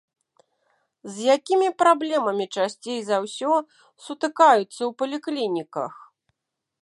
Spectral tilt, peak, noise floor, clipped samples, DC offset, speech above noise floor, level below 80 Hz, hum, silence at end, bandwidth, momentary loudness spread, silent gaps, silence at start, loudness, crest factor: -4 dB/octave; -2 dBFS; -82 dBFS; under 0.1%; under 0.1%; 59 dB; -82 dBFS; none; 0.9 s; 11.5 kHz; 14 LU; none; 1.05 s; -23 LUFS; 22 dB